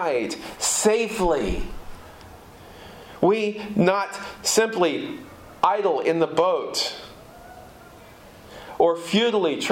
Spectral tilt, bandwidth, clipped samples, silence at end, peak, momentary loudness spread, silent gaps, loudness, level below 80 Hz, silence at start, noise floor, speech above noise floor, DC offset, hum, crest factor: -3.5 dB/octave; 16.5 kHz; under 0.1%; 0 s; -6 dBFS; 23 LU; none; -22 LUFS; -44 dBFS; 0 s; -46 dBFS; 24 dB; under 0.1%; none; 18 dB